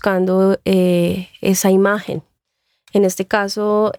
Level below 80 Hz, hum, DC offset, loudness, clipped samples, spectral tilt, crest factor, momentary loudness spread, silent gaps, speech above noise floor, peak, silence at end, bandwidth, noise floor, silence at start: -54 dBFS; none; under 0.1%; -16 LUFS; under 0.1%; -5.5 dB/octave; 14 dB; 7 LU; none; 55 dB; -2 dBFS; 0.05 s; 19.5 kHz; -70 dBFS; 0.05 s